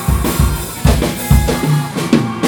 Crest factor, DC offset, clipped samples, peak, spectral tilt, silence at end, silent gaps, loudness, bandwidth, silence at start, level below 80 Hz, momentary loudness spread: 14 dB; under 0.1%; 0.2%; 0 dBFS; -5.5 dB/octave; 0 s; none; -15 LUFS; over 20 kHz; 0 s; -18 dBFS; 3 LU